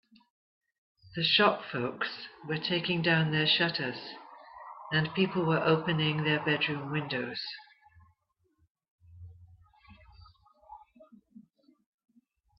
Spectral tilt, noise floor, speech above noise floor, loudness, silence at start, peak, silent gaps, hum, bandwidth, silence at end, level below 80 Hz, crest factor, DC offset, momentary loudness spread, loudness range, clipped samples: -8 dB/octave; -76 dBFS; 46 dB; -29 LUFS; 1.05 s; -10 dBFS; 8.70-8.75 s, 8.91-8.98 s; none; 5.8 kHz; 1.55 s; -68 dBFS; 24 dB; under 0.1%; 18 LU; 11 LU; under 0.1%